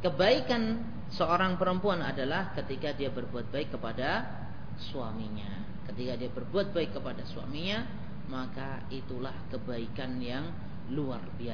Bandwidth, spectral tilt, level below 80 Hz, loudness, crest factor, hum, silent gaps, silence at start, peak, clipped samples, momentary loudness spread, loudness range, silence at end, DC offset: 5.4 kHz; -7 dB/octave; -52 dBFS; -34 LUFS; 22 dB; none; none; 0 s; -12 dBFS; under 0.1%; 13 LU; 7 LU; 0 s; 1%